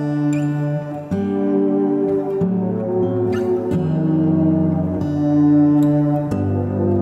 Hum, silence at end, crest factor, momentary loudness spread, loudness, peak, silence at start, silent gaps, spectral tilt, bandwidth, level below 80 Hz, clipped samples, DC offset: none; 0 s; 12 dB; 6 LU; -18 LUFS; -6 dBFS; 0 s; none; -10 dB/octave; 7.8 kHz; -50 dBFS; under 0.1%; under 0.1%